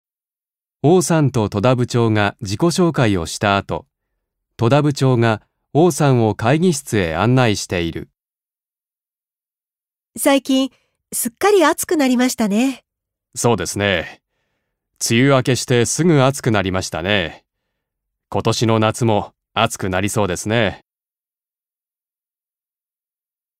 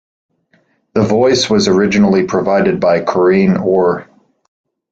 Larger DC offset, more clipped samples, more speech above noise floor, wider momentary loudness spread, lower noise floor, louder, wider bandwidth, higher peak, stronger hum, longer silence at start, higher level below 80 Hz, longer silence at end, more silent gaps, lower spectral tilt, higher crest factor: neither; neither; first, over 74 dB vs 46 dB; first, 8 LU vs 5 LU; first, under -90 dBFS vs -57 dBFS; second, -17 LUFS vs -12 LUFS; first, 16 kHz vs 8 kHz; about the same, 0 dBFS vs -2 dBFS; neither; about the same, 0.85 s vs 0.95 s; about the same, -48 dBFS vs -46 dBFS; first, 2.8 s vs 0.9 s; neither; about the same, -5 dB/octave vs -5.5 dB/octave; first, 18 dB vs 12 dB